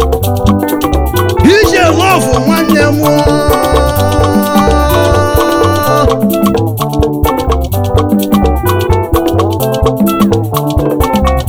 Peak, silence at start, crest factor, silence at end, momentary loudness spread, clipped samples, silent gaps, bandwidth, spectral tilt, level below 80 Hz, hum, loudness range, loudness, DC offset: 0 dBFS; 0 s; 10 dB; 0 s; 5 LU; 1%; none; over 20 kHz; -6 dB/octave; -18 dBFS; none; 3 LU; -10 LUFS; under 0.1%